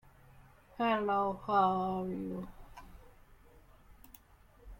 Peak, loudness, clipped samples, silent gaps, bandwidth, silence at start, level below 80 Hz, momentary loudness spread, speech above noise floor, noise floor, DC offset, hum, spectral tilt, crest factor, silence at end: -18 dBFS; -33 LUFS; under 0.1%; none; 16.5 kHz; 0.8 s; -58 dBFS; 25 LU; 29 dB; -61 dBFS; under 0.1%; none; -7 dB/octave; 20 dB; 0.05 s